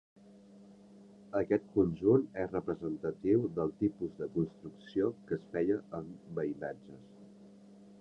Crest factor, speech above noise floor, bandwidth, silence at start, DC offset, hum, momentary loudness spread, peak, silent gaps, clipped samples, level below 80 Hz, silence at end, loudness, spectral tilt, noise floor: 20 dB; 23 dB; 6.6 kHz; 0.55 s; under 0.1%; none; 14 LU; -16 dBFS; none; under 0.1%; -64 dBFS; 0.05 s; -34 LUFS; -10 dB/octave; -57 dBFS